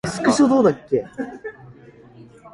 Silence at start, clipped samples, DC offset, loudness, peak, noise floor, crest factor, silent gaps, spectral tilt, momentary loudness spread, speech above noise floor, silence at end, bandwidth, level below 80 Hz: 0.05 s; under 0.1%; under 0.1%; -18 LUFS; -4 dBFS; -45 dBFS; 18 dB; none; -5.5 dB/octave; 19 LU; 27 dB; 0.05 s; 11.5 kHz; -56 dBFS